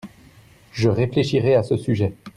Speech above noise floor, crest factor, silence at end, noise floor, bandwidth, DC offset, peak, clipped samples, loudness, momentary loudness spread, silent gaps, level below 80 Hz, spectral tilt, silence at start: 30 dB; 16 dB; 0.05 s; -50 dBFS; 11.5 kHz; under 0.1%; -6 dBFS; under 0.1%; -20 LUFS; 5 LU; none; -52 dBFS; -7.5 dB/octave; 0.05 s